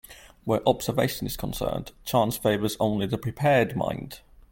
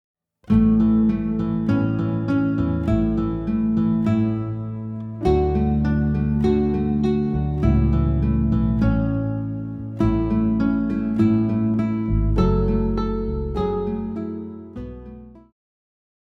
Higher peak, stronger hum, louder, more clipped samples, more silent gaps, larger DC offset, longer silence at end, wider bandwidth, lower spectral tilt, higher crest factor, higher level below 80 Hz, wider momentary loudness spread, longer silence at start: about the same, -6 dBFS vs -4 dBFS; neither; second, -26 LUFS vs -21 LUFS; neither; neither; neither; second, 0.35 s vs 1 s; first, 17 kHz vs 6 kHz; second, -5.5 dB/octave vs -10.5 dB/octave; about the same, 20 dB vs 16 dB; second, -48 dBFS vs -30 dBFS; about the same, 11 LU vs 11 LU; second, 0.1 s vs 0.5 s